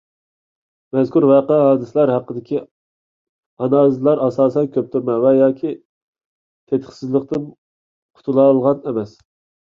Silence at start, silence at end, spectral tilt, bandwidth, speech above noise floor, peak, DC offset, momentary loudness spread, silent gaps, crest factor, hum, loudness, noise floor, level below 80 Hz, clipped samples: 0.95 s; 0.65 s; -9.5 dB/octave; 7 kHz; over 74 dB; -2 dBFS; under 0.1%; 12 LU; 2.71-3.57 s, 5.85-6.13 s, 6.25-6.67 s, 7.58-8.09 s; 16 dB; none; -17 LUFS; under -90 dBFS; -62 dBFS; under 0.1%